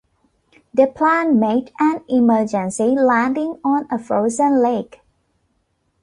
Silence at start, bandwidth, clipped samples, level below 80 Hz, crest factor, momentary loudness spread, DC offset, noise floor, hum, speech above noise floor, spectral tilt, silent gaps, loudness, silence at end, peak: 0.75 s; 11 kHz; under 0.1%; -60 dBFS; 16 dB; 6 LU; under 0.1%; -67 dBFS; none; 50 dB; -6 dB/octave; none; -17 LUFS; 1.2 s; -2 dBFS